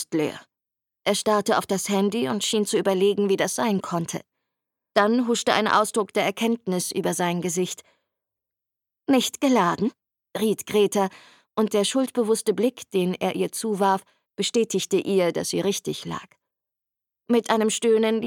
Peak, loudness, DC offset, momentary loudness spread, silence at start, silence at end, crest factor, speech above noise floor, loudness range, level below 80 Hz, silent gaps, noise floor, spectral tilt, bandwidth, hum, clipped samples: -4 dBFS; -23 LUFS; under 0.1%; 8 LU; 0 s; 0 s; 20 dB; 64 dB; 3 LU; -70 dBFS; none; -87 dBFS; -4 dB/octave; 17.5 kHz; none; under 0.1%